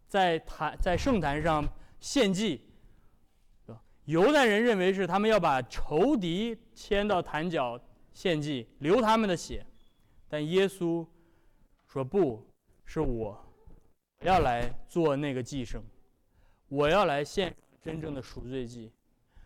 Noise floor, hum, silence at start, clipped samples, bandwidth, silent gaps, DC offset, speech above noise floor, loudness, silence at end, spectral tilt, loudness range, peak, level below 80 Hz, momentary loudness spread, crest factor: -64 dBFS; none; 0.1 s; under 0.1%; 16.5 kHz; none; under 0.1%; 36 dB; -29 LUFS; 0.6 s; -5.5 dB/octave; 6 LU; -18 dBFS; -46 dBFS; 16 LU; 12 dB